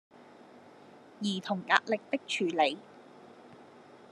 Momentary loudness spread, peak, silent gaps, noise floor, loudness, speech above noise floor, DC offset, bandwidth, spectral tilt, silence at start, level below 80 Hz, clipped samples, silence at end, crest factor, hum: 25 LU; -6 dBFS; none; -55 dBFS; -30 LUFS; 24 dB; under 0.1%; 11.5 kHz; -4 dB/octave; 0.2 s; under -90 dBFS; under 0.1%; 0.15 s; 28 dB; none